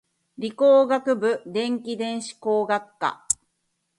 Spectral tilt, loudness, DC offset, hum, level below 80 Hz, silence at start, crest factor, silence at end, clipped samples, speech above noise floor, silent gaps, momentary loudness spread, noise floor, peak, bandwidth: -3 dB/octave; -23 LUFS; under 0.1%; none; -70 dBFS; 0.4 s; 18 dB; 0.65 s; under 0.1%; 52 dB; none; 12 LU; -75 dBFS; -4 dBFS; 11.5 kHz